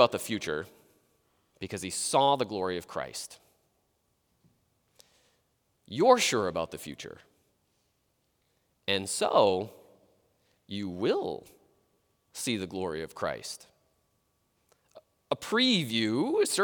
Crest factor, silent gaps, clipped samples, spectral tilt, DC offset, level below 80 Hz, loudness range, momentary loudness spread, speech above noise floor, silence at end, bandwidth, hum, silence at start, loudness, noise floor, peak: 26 dB; none; under 0.1%; -3.5 dB/octave; under 0.1%; -72 dBFS; 7 LU; 18 LU; 46 dB; 0 s; over 20 kHz; none; 0 s; -29 LUFS; -75 dBFS; -6 dBFS